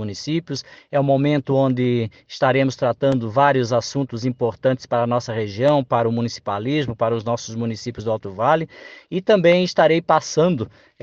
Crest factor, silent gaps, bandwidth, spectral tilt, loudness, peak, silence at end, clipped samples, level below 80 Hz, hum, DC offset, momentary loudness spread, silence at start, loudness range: 18 dB; none; 7.8 kHz; -6 dB/octave; -20 LUFS; -2 dBFS; 0.35 s; under 0.1%; -58 dBFS; none; under 0.1%; 10 LU; 0 s; 3 LU